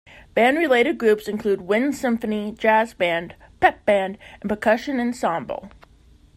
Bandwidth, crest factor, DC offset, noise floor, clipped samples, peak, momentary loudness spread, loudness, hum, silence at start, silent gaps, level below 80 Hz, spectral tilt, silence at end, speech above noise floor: 15.5 kHz; 18 dB; under 0.1%; -52 dBFS; under 0.1%; -4 dBFS; 11 LU; -21 LUFS; none; 0.15 s; none; -54 dBFS; -5 dB/octave; 0.7 s; 31 dB